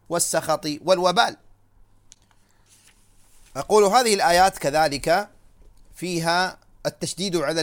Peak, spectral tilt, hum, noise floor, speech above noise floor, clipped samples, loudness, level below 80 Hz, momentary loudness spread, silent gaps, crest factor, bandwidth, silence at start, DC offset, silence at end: -2 dBFS; -3 dB/octave; none; -58 dBFS; 37 dB; under 0.1%; -21 LUFS; -52 dBFS; 14 LU; none; 20 dB; 18 kHz; 0.1 s; under 0.1%; 0 s